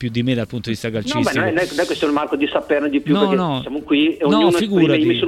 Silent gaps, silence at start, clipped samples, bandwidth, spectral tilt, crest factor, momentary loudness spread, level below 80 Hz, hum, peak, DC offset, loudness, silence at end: none; 0 s; under 0.1%; 14.5 kHz; -6 dB/octave; 16 dB; 8 LU; -50 dBFS; none; -2 dBFS; under 0.1%; -18 LUFS; 0 s